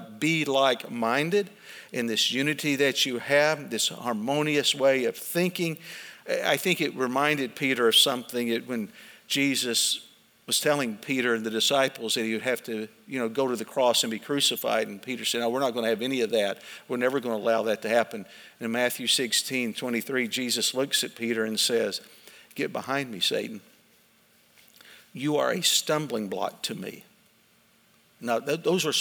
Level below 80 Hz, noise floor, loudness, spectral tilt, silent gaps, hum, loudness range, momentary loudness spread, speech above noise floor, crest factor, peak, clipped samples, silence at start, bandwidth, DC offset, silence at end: -82 dBFS; -62 dBFS; -26 LUFS; -2.5 dB/octave; none; none; 4 LU; 11 LU; 36 dB; 20 dB; -8 dBFS; under 0.1%; 0 s; over 20 kHz; under 0.1%; 0 s